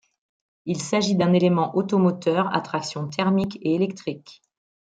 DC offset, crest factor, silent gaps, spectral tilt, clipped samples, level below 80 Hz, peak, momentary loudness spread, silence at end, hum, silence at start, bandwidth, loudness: under 0.1%; 18 dB; none; -6 dB/octave; under 0.1%; -64 dBFS; -6 dBFS; 12 LU; 0.55 s; none; 0.65 s; 9.2 kHz; -23 LUFS